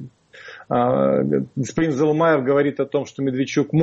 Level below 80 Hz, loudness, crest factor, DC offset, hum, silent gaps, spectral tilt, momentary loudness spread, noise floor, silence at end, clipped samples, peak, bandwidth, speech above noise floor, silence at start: -56 dBFS; -20 LUFS; 14 dB; under 0.1%; none; none; -7 dB/octave; 7 LU; -43 dBFS; 0 s; under 0.1%; -6 dBFS; 8 kHz; 23 dB; 0 s